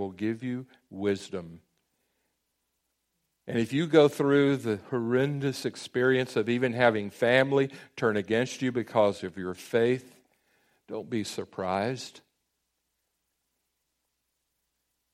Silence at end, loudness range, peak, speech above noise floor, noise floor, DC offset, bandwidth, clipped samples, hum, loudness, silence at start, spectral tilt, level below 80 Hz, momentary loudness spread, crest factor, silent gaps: 2.95 s; 11 LU; -6 dBFS; 53 dB; -80 dBFS; under 0.1%; 14.5 kHz; under 0.1%; none; -27 LUFS; 0 s; -6 dB/octave; -70 dBFS; 13 LU; 22 dB; none